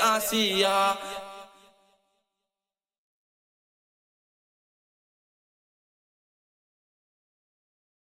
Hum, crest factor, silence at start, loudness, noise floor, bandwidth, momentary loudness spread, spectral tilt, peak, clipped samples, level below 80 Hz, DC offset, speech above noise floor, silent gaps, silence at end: none; 24 dB; 0 s; -24 LUFS; under -90 dBFS; 16.5 kHz; 20 LU; -2 dB/octave; -10 dBFS; under 0.1%; -72 dBFS; under 0.1%; over 64 dB; none; 6.55 s